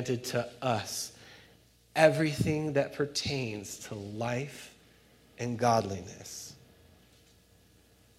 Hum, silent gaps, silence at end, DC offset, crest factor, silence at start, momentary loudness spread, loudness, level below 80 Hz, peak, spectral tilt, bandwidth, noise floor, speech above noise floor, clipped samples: none; none; 1.65 s; under 0.1%; 26 dB; 0 s; 18 LU; -31 LUFS; -64 dBFS; -8 dBFS; -5 dB/octave; 16 kHz; -62 dBFS; 31 dB; under 0.1%